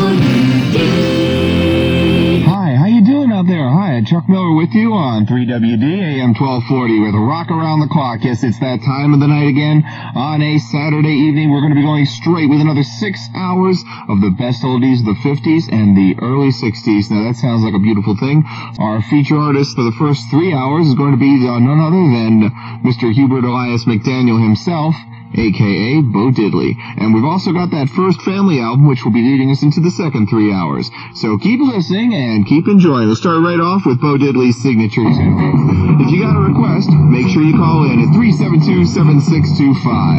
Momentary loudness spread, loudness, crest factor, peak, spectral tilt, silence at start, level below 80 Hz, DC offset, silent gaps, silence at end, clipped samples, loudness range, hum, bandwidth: 6 LU; -12 LUFS; 12 dB; 0 dBFS; -8 dB/octave; 0 s; -42 dBFS; under 0.1%; none; 0 s; under 0.1%; 3 LU; none; 7.8 kHz